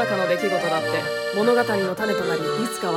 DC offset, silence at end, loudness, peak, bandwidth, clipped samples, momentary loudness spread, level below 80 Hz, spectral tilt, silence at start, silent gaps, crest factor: under 0.1%; 0 s; -22 LUFS; -8 dBFS; 17.5 kHz; under 0.1%; 5 LU; -62 dBFS; -4.5 dB/octave; 0 s; none; 14 dB